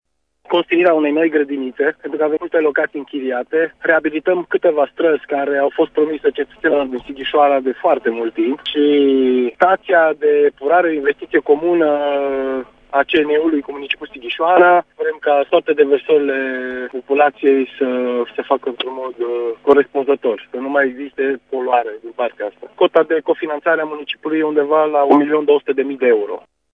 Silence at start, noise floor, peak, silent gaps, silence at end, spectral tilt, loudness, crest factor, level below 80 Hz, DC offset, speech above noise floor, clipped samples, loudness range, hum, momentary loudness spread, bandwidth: 0.5 s; -36 dBFS; 0 dBFS; none; 0.35 s; -7 dB/octave; -16 LUFS; 16 dB; -60 dBFS; under 0.1%; 20 dB; under 0.1%; 4 LU; none; 10 LU; 4.1 kHz